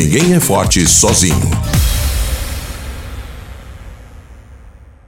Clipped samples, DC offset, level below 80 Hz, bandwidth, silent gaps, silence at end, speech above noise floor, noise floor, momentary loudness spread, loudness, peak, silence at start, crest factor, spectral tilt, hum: under 0.1%; under 0.1%; -22 dBFS; 17 kHz; none; 0.25 s; 28 dB; -38 dBFS; 24 LU; -12 LUFS; 0 dBFS; 0 s; 14 dB; -4 dB/octave; none